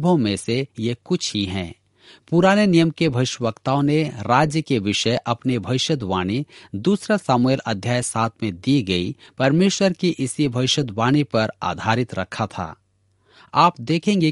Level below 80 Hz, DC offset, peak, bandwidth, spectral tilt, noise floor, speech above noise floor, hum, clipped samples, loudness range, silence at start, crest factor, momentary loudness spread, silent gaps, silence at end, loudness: -54 dBFS; under 0.1%; -2 dBFS; 11.5 kHz; -5.5 dB/octave; -63 dBFS; 43 dB; none; under 0.1%; 3 LU; 0 s; 18 dB; 9 LU; none; 0 s; -20 LUFS